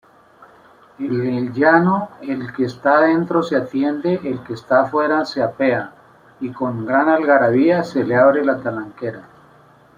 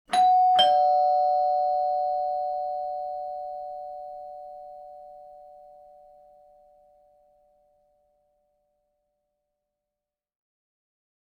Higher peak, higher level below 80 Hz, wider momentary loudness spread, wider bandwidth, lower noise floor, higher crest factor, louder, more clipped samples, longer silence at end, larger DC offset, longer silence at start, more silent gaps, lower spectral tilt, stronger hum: first, -2 dBFS vs -8 dBFS; first, -62 dBFS vs -70 dBFS; second, 14 LU vs 24 LU; second, 9.4 kHz vs 11.5 kHz; second, -49 dBFS vs -89 dBFS; about the same, 16 dB vs 20 dB; first, -17 LUFS vs -24 LUFS; neither; second, 0.75 s vs 5.75 s; neither; first, 1 s vs 0.1 s; neither; first, -7.5 dB/octave vs -1.5 dB/octave; neither